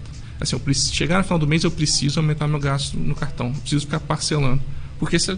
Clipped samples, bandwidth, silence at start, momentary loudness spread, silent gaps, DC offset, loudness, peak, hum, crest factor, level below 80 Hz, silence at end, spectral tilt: under 0.1%; 10 kHz; 0 s; 8 LU; none; under 0.1%; -21 LUFS; -2 dBFS; none; 18 dB; -32 dBFS; 0 s; -4.5 dB/octave